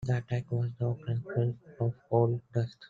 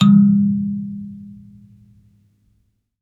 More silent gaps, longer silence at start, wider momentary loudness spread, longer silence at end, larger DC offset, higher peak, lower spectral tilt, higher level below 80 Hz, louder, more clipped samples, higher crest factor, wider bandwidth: neither; about the same, 0 s vs 0 s; second, 6 LU vs 25 LU; second, 0.05 s vs 1.7 s; neither; second, -12 dBFS vs -2 dBFS; about the same, -9 dB/octave vs -8 dB/octave; about the same, -62 dBFS vs -62 dBFS; second, -32 LUFS vs -16 LUFS; neither; about the same, 18 dB vs 18 dB; about the same, 7.2 kHz vs 6.8 kHz